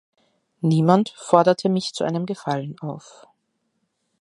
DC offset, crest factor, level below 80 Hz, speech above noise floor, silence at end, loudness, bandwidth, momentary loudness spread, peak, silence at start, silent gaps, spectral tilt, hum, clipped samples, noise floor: under 0.1%; 22 dB; -68 dBFS; 52 dB; 1.2 s; -21 LUFS; 11 kHz; 15 LU; 0 dBFS; 0.65 s; none; -6.5 dB/octave; none; under 0.1%; -73 dBFS